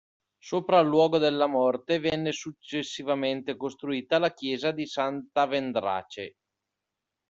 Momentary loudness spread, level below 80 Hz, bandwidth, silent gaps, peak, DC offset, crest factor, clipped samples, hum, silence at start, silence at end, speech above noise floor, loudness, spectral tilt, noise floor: 12 LU; -68 dBFS; 7.8 kHz; none; -8 dBFS; under 0.1%; 20 dB; under 0.1%; none; 0.45 s; 1 s; 59 dB; -27 LUFS; -5 dB/octave; -86 dBFS